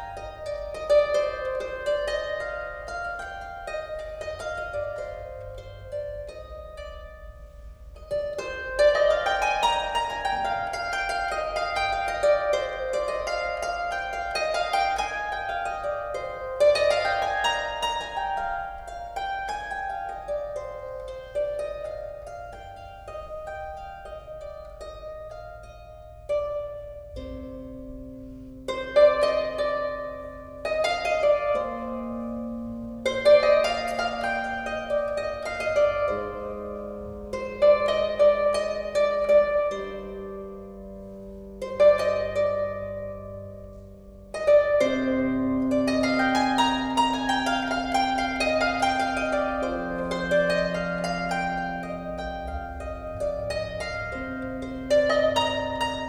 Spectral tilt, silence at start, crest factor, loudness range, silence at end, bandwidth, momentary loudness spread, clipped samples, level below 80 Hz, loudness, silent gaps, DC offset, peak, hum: -4.5 dB/octave; 0 s; 20 dB; 12 LU; 0 s; 12 kHz; 19 LU; under 0.1%; -46 dBFS; -26 LUFS; none; under 0.1%; -8 dBFS; none